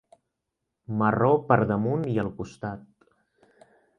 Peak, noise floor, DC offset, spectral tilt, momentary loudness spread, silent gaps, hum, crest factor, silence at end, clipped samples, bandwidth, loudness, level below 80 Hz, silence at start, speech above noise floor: -4 dBFS; -83 dBFS; under 0.1%; -9 dB/octave; 15 LU; none; none; 22 dB; 1.2 s; under 0.1%; 9.6 kHz; -25 LUFS; -58 dBFS; 0.9 s; 58 dB